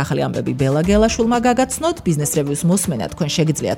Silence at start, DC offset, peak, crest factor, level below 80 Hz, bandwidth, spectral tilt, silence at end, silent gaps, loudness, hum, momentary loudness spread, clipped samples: 0 s; under 0.1%; -4 dBFS; 14 dB; -36 dBFS; 17 kHz; -5 dB/octave; 0 s; none; -18 LUFS; none; 5 LU; under 0.1%